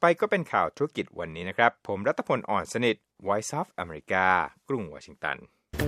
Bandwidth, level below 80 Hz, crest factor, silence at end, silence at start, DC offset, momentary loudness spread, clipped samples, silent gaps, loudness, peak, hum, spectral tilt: 14.5 kHz; -54 dBFS; 24 dB; 0 s; 0 s; under 0.1%; 11 LU; under 0.1%; none; -28 LUFS; -4 dBFS; none; -5 dB/octave